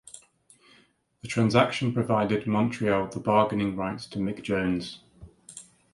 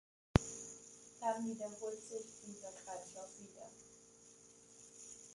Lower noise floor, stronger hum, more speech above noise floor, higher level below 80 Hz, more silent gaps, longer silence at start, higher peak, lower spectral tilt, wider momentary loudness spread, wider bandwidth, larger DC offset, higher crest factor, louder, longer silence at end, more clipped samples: about the same, -62 dBFS vs -63 dBFS; neither; first, 37 dB vs 17 dB; about the same, -56 dBFS vs -56 dBFS; neither; second, 0.15 s vs 0.35 s; first, -6 dBFS vs -10 dBFS; first, -6.5 dB/octave vs -5 dB/octave; about the same, 22 LU vs 23 LU; about the same, 11.5 kHz vs 11.5 kHz; neither; second, 22 dB vs 34 dB; first, -26 LUFS vs -44 LUFS; first, 0.3 s vs 0 s; neither